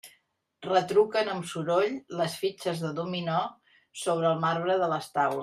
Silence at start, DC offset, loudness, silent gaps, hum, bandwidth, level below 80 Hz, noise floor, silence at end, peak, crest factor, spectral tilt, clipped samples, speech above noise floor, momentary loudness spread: 0.05 s; under 0.1%; -28 LUFS; none; none; 15 kHz; -74 dBFS; -69 dBFS; 0 s; -12 dBFS; 18 dB; -5 dB/octave; under 0.1%; 42 dB; 8 LU